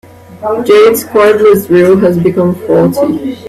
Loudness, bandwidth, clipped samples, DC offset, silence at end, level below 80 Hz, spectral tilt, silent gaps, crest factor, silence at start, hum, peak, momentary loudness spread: -8 LUFS; 15.5 kHz; under 0.1%; under 0.1%; 0 s; -46 dBFS; -6.5 dB/octave; none; 8 dB; 0.3 s; none; 0 dBFS; 8 LU